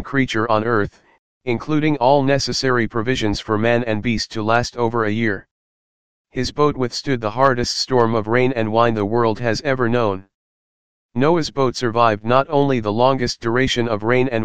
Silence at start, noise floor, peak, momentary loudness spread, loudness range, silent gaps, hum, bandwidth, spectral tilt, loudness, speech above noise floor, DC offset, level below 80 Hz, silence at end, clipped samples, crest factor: 0 s; under -90 dBFS; 0 dBFS; 6 LU; 3 LU; 1.19-1.41 s, 5.51-6.25 s, 10.34-11.09 s; none; 9.6 kHz; -5.5 dB/octave; -19 LUFS; over 72 dB; 2%; -44 dBFS; 0 s; under 0.1%; 18 dB